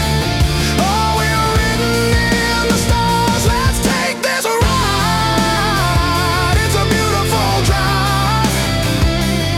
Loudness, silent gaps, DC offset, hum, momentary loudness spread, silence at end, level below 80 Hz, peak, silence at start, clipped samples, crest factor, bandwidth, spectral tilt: -14 LUFS; none; under 0.1%; none; 2 LU; 0 s; -24 dBFS; -2 dBFS; 0 s; under 0.1%; 12 dB; 17 kHz; -4.5 dB/octave